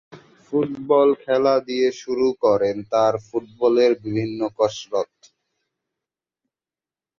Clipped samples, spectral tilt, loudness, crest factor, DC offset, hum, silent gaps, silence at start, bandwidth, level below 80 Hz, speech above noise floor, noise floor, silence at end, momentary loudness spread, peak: under 0.1%; -6 dB/octave; -21 LUFS; 16 dB; under 0.1%; none; none; 0.15 s; 7.4 kHz; -62 dBFS; over 70 dB; under -90 dBFS; 2.15 s; 9 LU; -6 dBFS